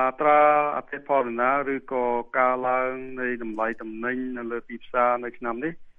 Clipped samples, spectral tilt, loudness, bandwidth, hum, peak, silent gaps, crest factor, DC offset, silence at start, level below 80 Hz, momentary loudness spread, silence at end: under 0.1%; -8 dB/octave; -25 LUFS; 3.8 kHz; none; -6 dBFS; none; 18 dB; under 0.1%; 0 s; -56 dBFS; 12 LU; 0.1 s